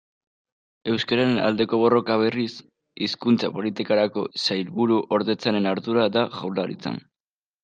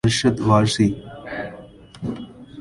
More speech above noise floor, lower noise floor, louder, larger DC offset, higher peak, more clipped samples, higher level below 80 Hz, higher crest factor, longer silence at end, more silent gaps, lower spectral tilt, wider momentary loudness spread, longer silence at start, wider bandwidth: first, over 68 dB vs 23 dB; first, under -90 dBFS vs -42 dBFS; second, -23 LUFS vs -20 LUFS; neither; second, -6 dBFS vs -2 dBFS; neither; second, -68 dBFS vs -46 dBFS; about the same, 18 dB vs 20 dB; first, 0.65 s vs 0 s; neither; about the same, -6 dB/octave vs -5.5 dB/octave; second, 9 LU vs 18 LU; first, 0.85 s vs 0.05 s; second, 9 kHz vs 11.5 kHz